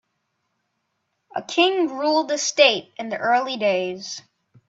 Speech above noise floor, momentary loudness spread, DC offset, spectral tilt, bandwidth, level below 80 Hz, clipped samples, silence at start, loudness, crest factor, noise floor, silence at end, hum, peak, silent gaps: 54 dB; 16 LU; under 0.1%; -2 dB/octave; 8 kHz; -74 dBFS; under 0.1%; 1.35 s; -20 LUFS; 22 dB; -75 dBFS; 0.5 s; none; -2 dBFS; none